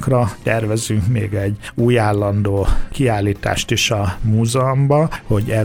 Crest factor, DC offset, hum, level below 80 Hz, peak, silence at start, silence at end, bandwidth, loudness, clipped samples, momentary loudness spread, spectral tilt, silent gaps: 14 dB; under 0.1%; none; -28 dBFS; -2 dBFS; 0 s; 0 s; 16 kHz; -18 LUFS; under 0.1%; 5 LU; -5.5 dB/octave; none